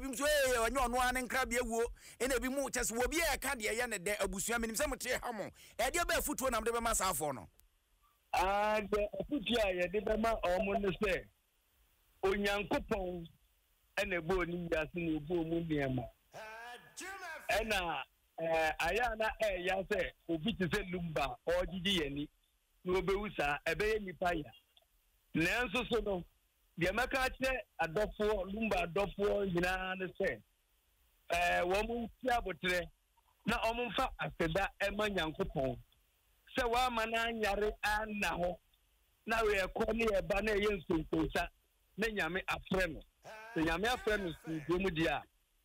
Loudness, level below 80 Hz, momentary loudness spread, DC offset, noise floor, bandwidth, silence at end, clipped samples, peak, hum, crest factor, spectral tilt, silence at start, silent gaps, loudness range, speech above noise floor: -35 LUFS; -52 dBFS; 9 LU; under 0.1%; -75 dBFS; 16 kHz; 0.4 s; under 0.1%; -22 dBFS; none; 14 dB; -4 dB/octave; 0 s; none; 3 LU; 39 dB